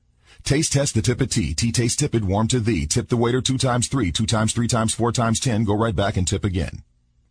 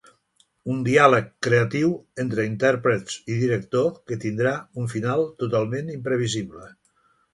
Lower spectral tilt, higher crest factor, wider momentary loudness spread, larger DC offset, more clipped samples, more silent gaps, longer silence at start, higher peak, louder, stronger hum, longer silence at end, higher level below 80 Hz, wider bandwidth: second, -4.5 dB/octave vs -6 dB/octave; second, 16 dB vs 22 dB; second, 3 LU vs 12 LU; neither; neither; neither; second, 0.45 s vs 0.65 s; second, -6 dBFS vs 0 dBFS; about the same, -21 LUFS vs -23 LUFS; neither; second, 0.5 s vs 0.65 s; first, -38 dBFS vs -60 dBFS; about the same, 10.5 kHz vs 11.5 kHz